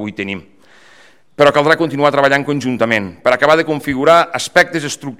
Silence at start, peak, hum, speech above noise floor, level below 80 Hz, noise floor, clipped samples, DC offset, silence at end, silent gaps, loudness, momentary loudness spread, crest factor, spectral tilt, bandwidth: 0 s; 0 dBFS; none; 34 dB; -52 dBFS; -48 dBFS; 0.2%; 0.3%; 0.05 s; none; -13 LUFS; 10 LU; 14 dB; -4.5 dB/octave; 16 kHz